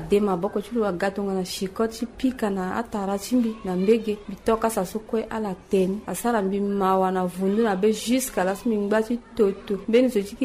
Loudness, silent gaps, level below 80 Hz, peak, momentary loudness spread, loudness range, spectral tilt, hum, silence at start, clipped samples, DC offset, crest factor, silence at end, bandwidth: -24 LUFS; none; -50 dBFS; -8 dBFS; 7 LU; 3 LU; -5.5 dB/octave; none; 0 s; under 0.1%; under 0.1%; 16 dB; 0 s; 15.5 kHz